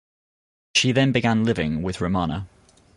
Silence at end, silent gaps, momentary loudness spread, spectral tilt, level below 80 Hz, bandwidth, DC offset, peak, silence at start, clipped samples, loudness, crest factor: 0.5 s; none; 9 LU; -5 dB/octave; -44 dBFS; 11.5 kHz; under 0.1%; -6 dBFS; 0.75 s; under 0.1%; -22 LUFS; 18 dB